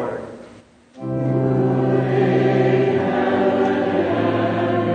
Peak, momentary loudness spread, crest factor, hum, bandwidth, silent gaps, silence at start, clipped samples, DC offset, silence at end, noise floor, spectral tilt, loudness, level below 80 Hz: -6 dBFS; 11 LU; 14 dB; none; 7.2 kHz; none; 0 s; under 0.1%; under 0.1%; 0 s; -46 dBFS; -8.5 dB/octave; -19 LUFS; -56 dBFS